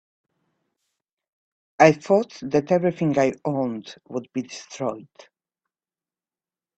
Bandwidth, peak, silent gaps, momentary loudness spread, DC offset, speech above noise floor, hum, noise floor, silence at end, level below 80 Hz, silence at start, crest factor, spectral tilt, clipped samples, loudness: 8.4 kHz; 0 dBFS; none; 16 LU; under 0.1%; over 68 dB; none; under -90 dBFS; 1.8 s; -66 dBFS; 1.8 s; 24 dB; -6.5 dB/octave; under 0.1%; -22 LUFS